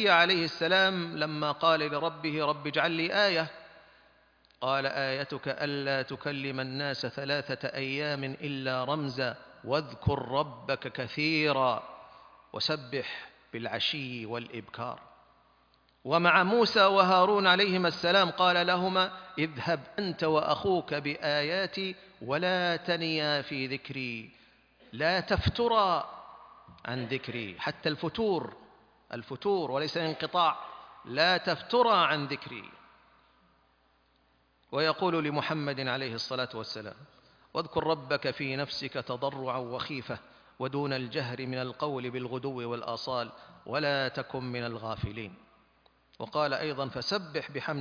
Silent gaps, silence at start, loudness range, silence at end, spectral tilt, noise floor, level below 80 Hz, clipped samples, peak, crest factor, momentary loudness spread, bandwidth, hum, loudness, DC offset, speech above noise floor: none; 0 s; 9 LU; 0 s; -5.5 dB/octave; -68 dBFS; -58 dBFS; under 0.1%; -8 dBFS; 24 dB; 15 LU; 5.4 kHz; none; -30 LUFS; under 0.1%; 38 dB